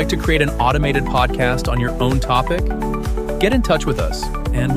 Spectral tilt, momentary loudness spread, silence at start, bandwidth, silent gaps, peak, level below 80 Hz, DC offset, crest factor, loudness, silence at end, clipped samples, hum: -6 dB/octave; 6 LU; 0 s; 15.5 kHz; none; -2 dBFS; -22 dBFS; under 0.1%; 16 dB; -18 LUFS; 0 s; under 0.1%; none